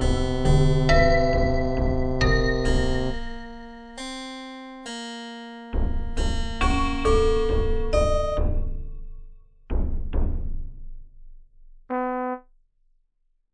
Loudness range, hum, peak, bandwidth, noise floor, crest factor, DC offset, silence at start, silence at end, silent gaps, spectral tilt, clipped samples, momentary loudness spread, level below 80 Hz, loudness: 11 LU; none; -4 dBFS; 9.8 kHz; -69 dBFS; 18 dB; under 0.1%; 0 s; 1.15 s; none; -6 dB/octave; under 0.1%; 18 LU; -26 dBFS; -25 LUFS